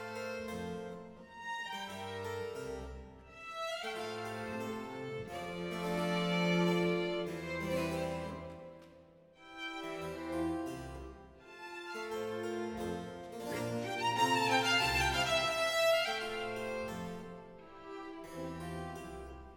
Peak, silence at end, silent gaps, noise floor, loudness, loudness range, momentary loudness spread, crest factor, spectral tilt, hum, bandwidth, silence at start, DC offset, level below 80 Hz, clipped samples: -16 dBFS; 0 s; none; -60 dBFS; -36 LUFS; 11 LU; 19 LU; 20 dB; -4.5 dB/octave; none; 19 kHz; 0 s; under 0.1%; -58 dBFS; under 0.1%